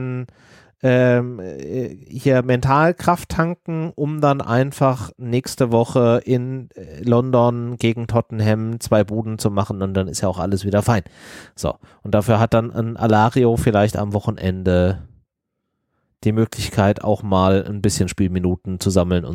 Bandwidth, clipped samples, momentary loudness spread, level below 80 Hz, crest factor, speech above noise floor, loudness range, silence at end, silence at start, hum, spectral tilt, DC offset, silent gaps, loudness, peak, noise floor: 16 kHz; under 0.1%; 11 LU; -42 dBFS; 18 dB; 59 dB; 3 LU; 0 s; 0 s; none; -6.5 dB/octave; under 0.1%; none; -19 LUFS; -2 dBFS; -77 dBFS